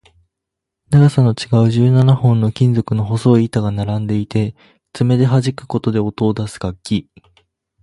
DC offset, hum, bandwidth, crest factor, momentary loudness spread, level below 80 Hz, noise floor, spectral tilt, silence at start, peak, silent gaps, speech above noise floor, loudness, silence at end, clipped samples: under 0.1%; none; 11.5 kHz; 14 dB; 10 LU; -44 dBFS; -81 dBFS; -8 dB/octave; 0.9 s; 0 dBFS; none; 66 dB; -16 LUFS; 0.8 s; under 0.1%